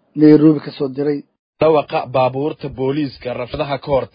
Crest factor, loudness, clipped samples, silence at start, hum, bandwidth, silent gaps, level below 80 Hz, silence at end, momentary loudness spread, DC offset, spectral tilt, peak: 16 dB; -17 LUFS; under 0.1%; 0.15 s; none; 5.2 kHz; 1.39-1.53 s; -46 dBFS; 0.1 s; 13 LU; under 0.1%; -11 dB/octave; 0 dBFS